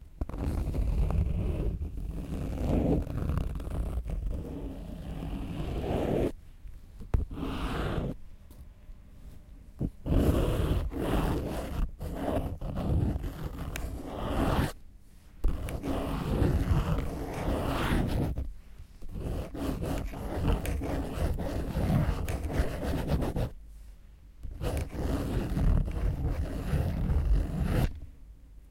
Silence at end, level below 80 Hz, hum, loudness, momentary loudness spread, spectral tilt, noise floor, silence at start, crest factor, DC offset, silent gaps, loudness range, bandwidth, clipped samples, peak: 0 s; -34 dBFS; none; -33 LUFS; 15 LU; -7.5 dB/octave; -51 dBFS; 0 s; 18 dB; under 0.1%; none; 4 LU; 16.5 kHz; under 0.1%; -12 dBFS